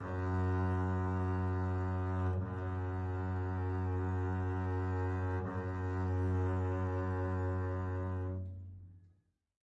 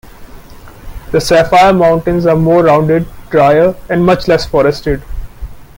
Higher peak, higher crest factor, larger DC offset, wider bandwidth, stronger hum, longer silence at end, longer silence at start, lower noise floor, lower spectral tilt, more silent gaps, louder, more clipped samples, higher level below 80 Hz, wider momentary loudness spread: second, -26 dBFS vs 0 dBFS; about the same, 10 dB vs 10 dB; neither; second, 4 kHz vs 17 kHz; neither; first, 0.6 s vs 0.15 s; about the same, 0 s vs 0.05 s; first, -71 dBFS vs -33 dBFS; first, -9.5 dB/octave vs -6.5 dB/octave; neither; second, -37 LUFS vs -10 LUFS; neither; second, -64 dBFS vs -30 dBFS; second, 5 LU vs 11 LU